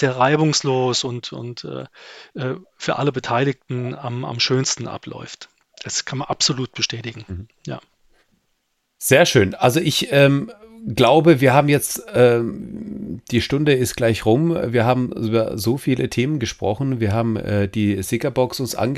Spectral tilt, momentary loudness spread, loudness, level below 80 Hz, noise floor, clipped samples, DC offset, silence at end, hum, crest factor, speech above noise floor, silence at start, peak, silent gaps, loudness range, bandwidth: -5 dB/octave; 18 LU; -19 LUFS; -50 dBFS; -70 dBFS; under 0.1%; under 0.1%; 0 s; none; 18 dB; 51 dB; 0 s; -2 dBFS; none; 9 LU; 15 kHz